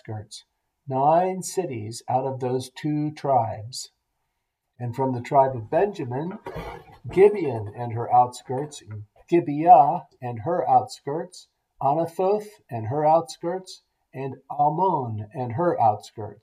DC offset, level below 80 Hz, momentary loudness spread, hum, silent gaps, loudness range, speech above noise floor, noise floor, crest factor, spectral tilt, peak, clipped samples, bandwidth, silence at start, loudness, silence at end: under 0.1%; -60 dBFS; 17 LU; none; none; 6 LU; 55 dB; -78 dBFS; 22 dB; -6.5 dB/octave; -2 dBFS; under 0.1%; 14.5 kHz; 0.1 s; -23 LUFS; 0.1 s